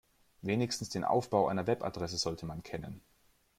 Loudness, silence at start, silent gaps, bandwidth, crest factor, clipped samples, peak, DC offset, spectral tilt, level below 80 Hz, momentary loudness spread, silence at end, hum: -34 LUFS; 0.45 s; none; 16.5 kHz; 20 dB; under 0.1%; -14 dBFS; under 0.1%; -5 dB/octave; -62 dBFS; 13 LU; 0.6 s; none